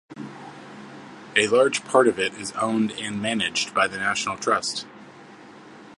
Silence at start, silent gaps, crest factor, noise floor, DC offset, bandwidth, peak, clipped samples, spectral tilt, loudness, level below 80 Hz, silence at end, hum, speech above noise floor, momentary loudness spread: 0.1 s; none; 22 dB; -45 dBFS; under 0.1%; 11.5 kHz; -2 dBFS; under 0.1%; -3 dB/octave; -23 LUFS; -66 dBFS; 0 s; none; 23 dB; 22 LU